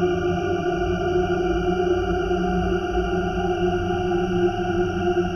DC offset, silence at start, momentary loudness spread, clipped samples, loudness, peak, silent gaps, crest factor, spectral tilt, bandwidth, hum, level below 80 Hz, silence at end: under 0.1%; 0 s; 2 LU; under 0.1%; -23 LUFS; -10 dBFS; none; 12 dB; -7 dB/octave; 6.6 kHz; none; -34 dBFS; 0 s